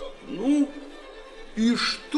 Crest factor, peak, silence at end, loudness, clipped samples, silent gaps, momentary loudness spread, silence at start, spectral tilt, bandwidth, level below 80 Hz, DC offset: 14 dB; -12 dBFS; 0 s; -25 LUFS; under 0.1%; none; 21 LU; 0 s; -4 dB/octave; 11 kHz; -50 dBFS; under 0.1%